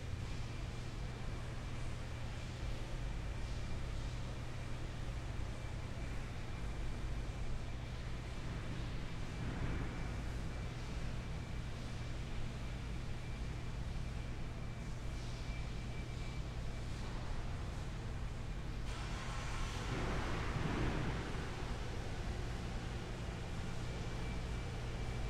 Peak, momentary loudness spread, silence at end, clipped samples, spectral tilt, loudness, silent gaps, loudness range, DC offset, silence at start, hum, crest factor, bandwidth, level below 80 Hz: -26 dBFS; 5 LU; 0 s; under 0.1%; -5.5 dB/octave; -44 LUFS; none; 4 LU; under 0.1%; 0 s; none; 16 dB; 13 kHz; -44 dBFS